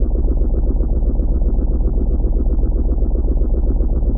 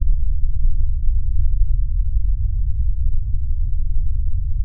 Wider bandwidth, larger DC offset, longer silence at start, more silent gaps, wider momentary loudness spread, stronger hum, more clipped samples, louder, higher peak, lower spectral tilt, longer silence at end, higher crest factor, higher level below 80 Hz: first, 1.5 kHz vs 0.2 kHz; first, 0.6% vs under 0.1%; about the same, 0 s vs 0 s; neither; second, 0 LU vs 3 LU; neither; neither; first, -20 LUFS vs -24 LUFS; about the same, -4 dBFS vs -4 dBFS; second, -17 dB/octave vs -20.5 dB/octave; about the same, 0 s vs 0 s; about the same, 10 dB vs 10 dB; about the same, -16 dBFS vs -16 dBFS